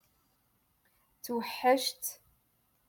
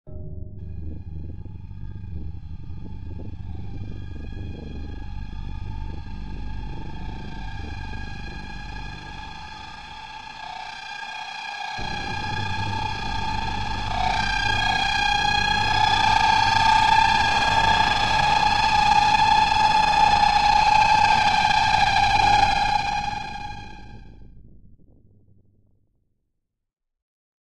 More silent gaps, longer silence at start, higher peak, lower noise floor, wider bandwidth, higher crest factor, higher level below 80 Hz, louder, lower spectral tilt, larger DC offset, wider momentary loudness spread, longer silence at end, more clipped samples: neither; first, 1.25 s vs 0.05 s; second, -14 dBFS vs -4 dBFS; second, -73 dBFS vs -77 dBFS; first, 17.5 kHz vs 12 kHz; about the same, 22 dB vs 18 dB; second, -78 dBFS vs -38 dBFS; second, -32 LUFS vs -20 LUFS; second, -1.5 dB/octave vs -3 dB/octave; second, under 0.1% vs 2%; second, 12 LU vs 20 LU; first, 0.75 s vs 0.5 s; neither